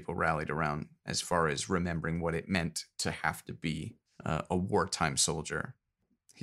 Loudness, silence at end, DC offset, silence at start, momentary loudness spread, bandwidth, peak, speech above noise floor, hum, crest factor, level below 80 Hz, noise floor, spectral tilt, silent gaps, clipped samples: -33 LUFS; 0 s; under 0.1%; 0 s; 9 LU; 15 kHz; -12 dBFS; 40 dB; none; 22 dB; -54 dBFS; -73 dBFS; -4 dB/octave; none; under 0.1%